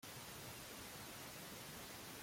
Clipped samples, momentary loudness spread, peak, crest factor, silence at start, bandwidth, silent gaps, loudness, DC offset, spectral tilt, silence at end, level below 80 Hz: under 0.1%; 0 LU; -40 dBFS; 14 dB; 0 s; 16.5 kHz; none; -51 LUFS; under 0.1%; -2.5 dB/octave; 0 s; -72 dBFS